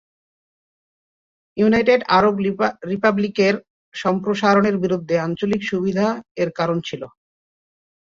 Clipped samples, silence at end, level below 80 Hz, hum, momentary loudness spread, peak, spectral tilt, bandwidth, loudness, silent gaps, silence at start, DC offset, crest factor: under 0.1%; 1.05 s; -56 dBFS; none; 10 LU; -2 dBFS; -6.5 dB/octave; 7.4 kHz; -19 LUFS; 3.70-3.92 s, 6.31-6.35 s; 1.55 s; under 0.1%; 18 dB